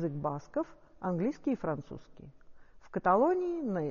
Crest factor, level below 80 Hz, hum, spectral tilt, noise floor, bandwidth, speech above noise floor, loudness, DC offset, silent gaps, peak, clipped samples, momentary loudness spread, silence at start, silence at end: 20 dB; -60 dBFS; none; -8 dB/octave; -52 dBFS; 7 kHz; 20 dB; -33 LUFS; under 0.1%; none; -14 dBFS; under 0.1%; 14 LU; 0 s; 0 s